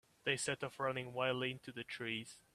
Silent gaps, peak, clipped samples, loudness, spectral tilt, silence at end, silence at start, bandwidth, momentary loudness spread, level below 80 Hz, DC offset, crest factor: none; -20 dBFS; under 0.1%; -40 LUFS; -3.5 dB/octave; 0.15 s; 0.25 s; 14.5 kHz; 7 LU; -78 dBFS; under 0.1%; 22 dB